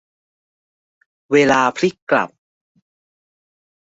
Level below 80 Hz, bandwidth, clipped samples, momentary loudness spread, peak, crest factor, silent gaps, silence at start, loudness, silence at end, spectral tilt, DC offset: -62 dBFS; 8 kHz; under 0.1%; 7 LU; -2 dBFS; 20 dB; 2.02-2.07 s; 1.3 s; -17 LUFS; 1.65 s; -5 dB/octave; under 0.1%